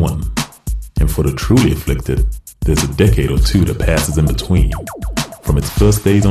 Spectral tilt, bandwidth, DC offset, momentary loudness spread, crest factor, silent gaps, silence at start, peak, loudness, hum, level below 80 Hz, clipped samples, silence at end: -6 dB/octave; 14 kHz; under 0.1%; 10 LU; 12 dB; none; 0 s; -2 dBFS; -16 LUFS; none; -20 dBFS; under 0.1%; 0 s